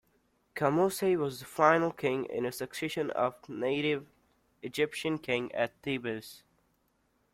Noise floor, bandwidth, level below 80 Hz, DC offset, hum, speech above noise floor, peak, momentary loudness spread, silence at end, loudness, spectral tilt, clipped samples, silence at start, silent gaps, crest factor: -73 dBFS; 16.5 kHz; -70 dBFS; under 0.1%; none; 42 dB; -8 dBFS; 10 LU; 0.95 s; -31 LUFS; -5 dB/octave; under 0.1%; 0.55 s; none; 24 dB